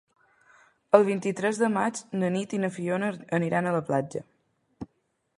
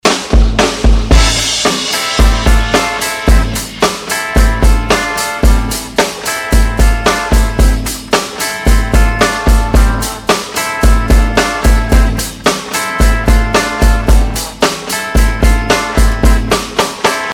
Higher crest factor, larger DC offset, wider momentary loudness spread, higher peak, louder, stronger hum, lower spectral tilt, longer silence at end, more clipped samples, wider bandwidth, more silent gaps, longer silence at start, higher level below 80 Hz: first, 26 dB vs 10 dB; neither; first, 18 LU vs 4 LU; about the same, -2 dBFS vs 0 dBFS; second, -27 LUFS vs -12 LUFS; neither; first, -6 dB/octave vs -4 dB/octave; first, 0.55 s vs 0 s; second, under 0.1% vs 0.3%; second, 11.5 kHz vs 16.5 kHz; neither; first, 0.95 s vs 0.05 s; second, -68 dBFS vs -12 dBFS